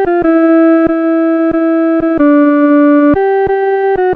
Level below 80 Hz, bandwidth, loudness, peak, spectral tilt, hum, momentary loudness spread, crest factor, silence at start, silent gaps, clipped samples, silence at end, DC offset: -40 dBFS; 4.2 kHz; -9 LUFS; 0 dBFS; -9.5 dB/octave; none; 4 LU; 8 dB; 0 s; none; under 0.1%; 0 s; under 0.1%